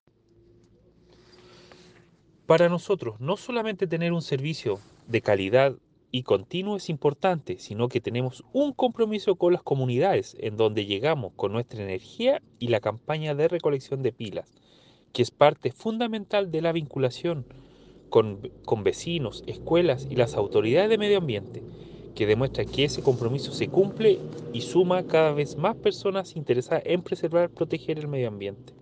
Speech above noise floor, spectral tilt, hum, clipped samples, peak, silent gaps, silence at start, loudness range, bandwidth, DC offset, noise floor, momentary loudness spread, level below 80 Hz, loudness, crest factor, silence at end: 34 dB; -6.5 dB/octave; none; under 0.1%; -4 dBFS; none; 2.5 s; 3 LU; 9.4 kHz; under 0.1%; -59 dBFS; 11 LU; -58 dBFS; -26 LUFS; 22 dB; 0.1 s